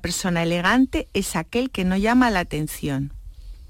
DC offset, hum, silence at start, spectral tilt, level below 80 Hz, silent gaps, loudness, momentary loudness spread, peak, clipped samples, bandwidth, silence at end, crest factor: under 0.1%; none; 0 s; -5 dB/octave; -38 dBFS; none; -22 LUFS; 9 LU; -8 dBFS; under 0.1%; 16.5 kHz; 0 s; 14 dB